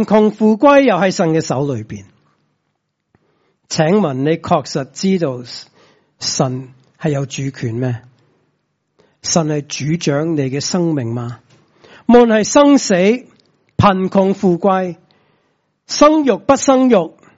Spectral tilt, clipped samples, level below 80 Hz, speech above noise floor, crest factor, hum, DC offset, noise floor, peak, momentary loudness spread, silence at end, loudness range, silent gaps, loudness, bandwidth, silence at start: -5.5 dB/octave; under 0.1%; -50 dBFS; 56 dB; 16 dB; none; under 0.1%; -70 dBFS; 0 dBFS; 14 LU; 0.3 s; 8 LU; none; -15 LUFS; 8 kHz; 0 s